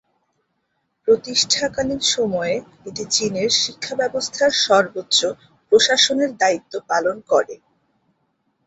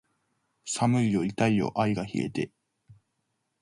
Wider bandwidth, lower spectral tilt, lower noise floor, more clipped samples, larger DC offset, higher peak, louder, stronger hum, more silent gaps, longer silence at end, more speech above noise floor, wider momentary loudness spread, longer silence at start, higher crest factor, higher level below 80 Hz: second, 8.2 kHz vs 11.5 kHz; second, -1.5 dB/octave vs -6 dB/octave; second, -72 dBFS vs -78 dBFS; neither; neither; first, -2 dBFS vs -10 dBFS; first, -18 LUFS vs -27 LUFS; neither; neither; first, 1.1 s vs 0.7 s; about the same, 52 dB vs 52 dB; about the same, 11 LU vs 10 LU; first, 1.05 s vs 0.65 s; about the same, 18 dB vs 18 dB; about the same, -58 dBFS vs -60 dBFS